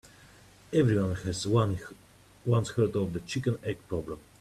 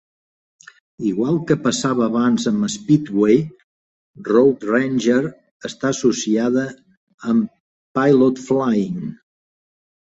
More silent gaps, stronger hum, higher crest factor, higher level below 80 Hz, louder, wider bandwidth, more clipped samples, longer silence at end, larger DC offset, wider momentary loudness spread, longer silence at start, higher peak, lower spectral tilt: second, none vs 3.64-4.14 s, 5.51-5.60 s, 6.97-7.07 s, 7.14-7.18 s, 7.60-7.95 s; neither; about the same, 18 dB vs 16 dB; about the same, -56 dBFS vs -60 dBFS; second, -30 LUFS vs -18 LUFS; first, 13.5 kHz vs 8.2 kHz; neither; second, 0.2 s vs 1.05 s; neither; second, 11 LU vs 14 LU; second, 0.7 s vs 1 s; second, -12 dBFS vs -2 dBFS; about the same, -6.5 dB/octave vs -5.5 dB/octave